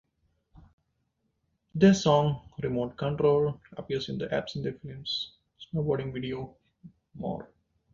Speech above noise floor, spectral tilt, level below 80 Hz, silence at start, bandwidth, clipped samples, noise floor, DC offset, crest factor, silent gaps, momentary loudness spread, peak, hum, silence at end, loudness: 49 dB; -6.5 dB/octave; -58 dBFS; 1.75 s; 7.6 kHz; under 0.1%; -77 dBFS; under 0.1%; 22 dB; none; 16 LU; -8 dBFS; none; 0.5 s; -29 LUFS